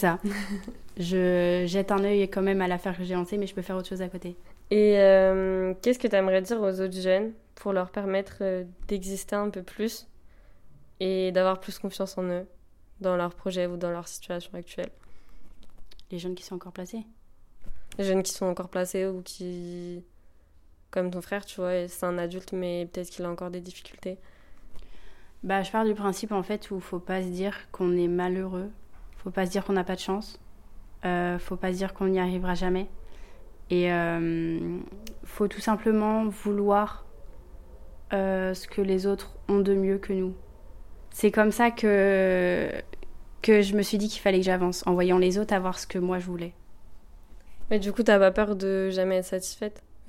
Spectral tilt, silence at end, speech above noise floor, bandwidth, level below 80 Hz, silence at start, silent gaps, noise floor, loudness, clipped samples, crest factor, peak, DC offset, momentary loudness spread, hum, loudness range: -5.5 dB/octave; 0 s; 28 dB; 16.5 kHz; -48 dBFS; 0 s; none; -55 dBFS; -27 LUFS; under 0.1%; 20 dB; -8 dBFS; under 0.1%; 15 LU; none; 9 LU